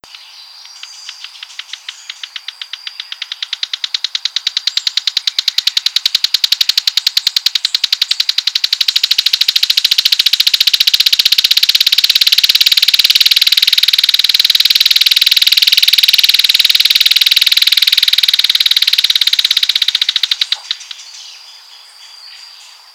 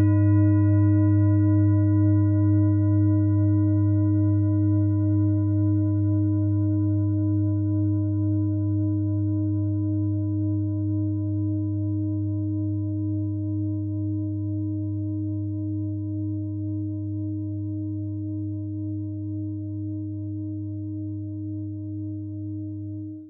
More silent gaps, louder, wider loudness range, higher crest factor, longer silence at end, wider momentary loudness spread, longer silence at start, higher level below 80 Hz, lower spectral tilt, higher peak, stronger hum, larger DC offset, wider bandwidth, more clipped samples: neither; first, -8 LUFS vs -25 LUFS; about the same, 11 LU vs 11 LU; about the same, 12 dB vs 12 dB; first, 0.45 s vs 0 s; first, 18 LU vs 12 LU; first, 0.15 s vs 0 s; about the same, -60 dBFS vs -58 dBFS; second, 4 dB/octave vs -12.5 dB/octave; first, 0 dBFS vs -12 dBFS; neither; neither; first, over 20 kHz vs 2.1 kHz; first, 2% vs under 0.1%